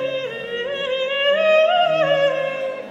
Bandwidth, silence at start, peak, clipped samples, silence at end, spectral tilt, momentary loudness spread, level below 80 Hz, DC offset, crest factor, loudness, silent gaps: 7.8 kHz; 0 s; -6 dBFS; under 0.1%; 0 s; -4 dB/octave; 11 LU; -66 dBFS; under 0.1%; 14 dB; -19 LUFS; none